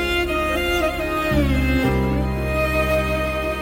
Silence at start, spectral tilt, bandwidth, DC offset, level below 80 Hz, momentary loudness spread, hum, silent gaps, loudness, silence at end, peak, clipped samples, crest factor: 0 s; -6 dB/octave; 16.5 kHz; under 0.1%; -26 dBFS; 3 LU; none; none; -20 LUFS; 0 s; -8 dBFS; under 0.1%; 12 dB